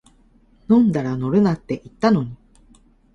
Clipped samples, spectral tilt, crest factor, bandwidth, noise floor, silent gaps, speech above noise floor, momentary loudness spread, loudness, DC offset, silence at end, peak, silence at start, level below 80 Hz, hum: under 0.1%; -8.5 dB/octave; 18 dB; 7.8 kHz; -54 dBFS; none; 36 dB; 11 LU; -19 LUFS; under 0.1%; 0.8 s; -2 dBFS; 0.7 s; -50 dBFS; none